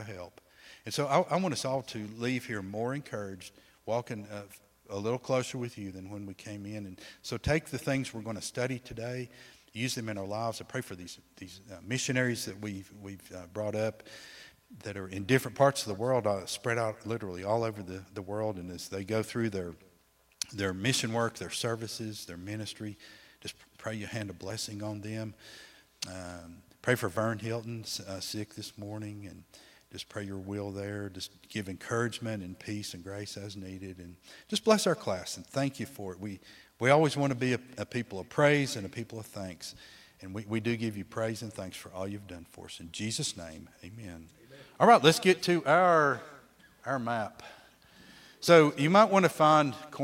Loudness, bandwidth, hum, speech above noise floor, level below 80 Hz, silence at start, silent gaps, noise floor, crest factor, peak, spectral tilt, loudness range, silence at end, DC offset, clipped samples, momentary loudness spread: -31 LUFS; 16.5 kHz; none; 35 dB; -64 dBFS; 0 s; none; -67 dBFS; 26 dB; -6 dBFS; -4.5 dB/octave; 12 LU; 0 s; under 0.1%; under 0.1%; 21 LU